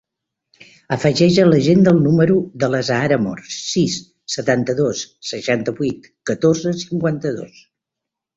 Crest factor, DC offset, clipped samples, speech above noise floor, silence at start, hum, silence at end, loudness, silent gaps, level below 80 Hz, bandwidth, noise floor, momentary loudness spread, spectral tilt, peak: 16 dB; under 0.1%; under 0.1%; 66 dB; 0.9 s; none; 0.9 s; -17 LUFS; none; -52 dBFS; 8 kHz; -83 dBFS; 14 LU; -6 dB/octave; -2 dBFS